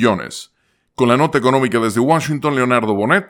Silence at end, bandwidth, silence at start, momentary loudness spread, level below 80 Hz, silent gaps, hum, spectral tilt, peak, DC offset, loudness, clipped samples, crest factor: 0.05 s; 17.5 kHz; 0 s; 11 LU; -56 dBFS; none; none; -5.5 dB/octave; 0 dBFS; under 0.1%; -16 LUFS; under 0.1%; 16 dB